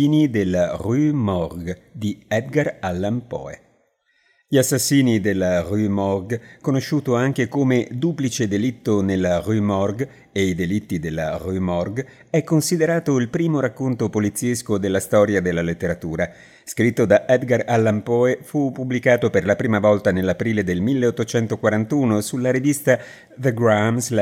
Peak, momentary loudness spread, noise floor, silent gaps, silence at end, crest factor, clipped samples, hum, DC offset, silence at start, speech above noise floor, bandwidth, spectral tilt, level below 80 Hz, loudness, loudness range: -2 dBFS; 8 LU; -64 dBFS; none; 0 s; 18 dB; under 0.1%; none; under 0.1%; 0 s; 44 dB; 16.5 kHz; -6 dB/octave; -54 dBFS; -20 LUFS; 4 LU